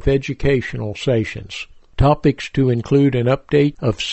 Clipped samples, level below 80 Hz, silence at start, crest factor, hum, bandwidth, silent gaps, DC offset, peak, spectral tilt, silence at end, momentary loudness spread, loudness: under 0.1%; -32 dBFS; 0 s; 16 dB; none; 8.4 kHz; none; under 0.1%; -2 dBFS; -7 dB/octave; 0 s; 12 LU; -18 LUFS